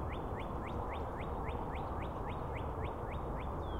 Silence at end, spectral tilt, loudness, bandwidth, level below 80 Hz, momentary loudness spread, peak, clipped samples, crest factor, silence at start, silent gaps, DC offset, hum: 0 s; -8 dB/octave; -41 LUFS; 16 kHz; -46 dBFS; 1 LU; -26 dBFS; under 0.1%; 14 dB; 0 s; none; 0.2%; none